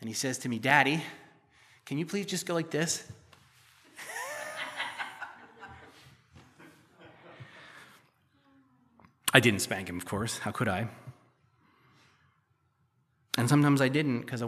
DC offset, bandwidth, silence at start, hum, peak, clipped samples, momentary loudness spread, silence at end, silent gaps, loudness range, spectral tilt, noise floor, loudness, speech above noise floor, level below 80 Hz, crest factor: under 0.1%; 15 kHz; 0 s; none; -2 dBFS; under 0.1%; 26 LU; 0 s; none; 13 LU; -4.5 dB/octave; -72 dBFS; -29 LUFS; 44 dB; -70 dBFS; 32 dB